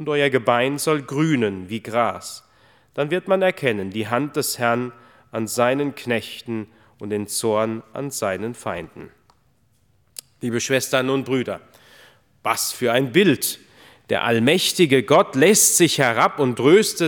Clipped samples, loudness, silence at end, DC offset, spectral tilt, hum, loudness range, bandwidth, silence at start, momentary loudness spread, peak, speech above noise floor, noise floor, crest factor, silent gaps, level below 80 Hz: under 0.1%; -20 LUFS; 0 s; under 0.1%; -3.5 dB/octave; none; 10 LU; 19.5 kHz; 0 s; 16 LU; 0 dBFS; 42 dB; -62 dBFS; 20 dB; none; -66 dBFS